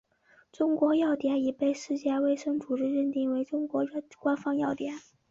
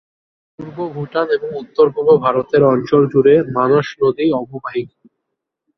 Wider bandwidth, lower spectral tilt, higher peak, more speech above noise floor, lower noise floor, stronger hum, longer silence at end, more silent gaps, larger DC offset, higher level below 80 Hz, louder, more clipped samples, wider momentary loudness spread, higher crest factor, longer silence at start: first, 7.6 kHz vs 6.2 kHz; second, -5.5 dB/octave vs -8.5 dB/octave; second, -14 dBFS vs -2 dBFS; second, 34 dB vs 62 dB; second, -63 dBFS vs -77 dBFS; neither; second, 0.3 s vs 0.9 s; neither; neither; second, -72 dBFS vs -56 dBFS; second, -29 LUFS vs -15 LUFS; neither; second, 7 LU vs 14 LU; about the same, 14 dB vs 14 dB; about the same, 0.6 s vs 0.6 s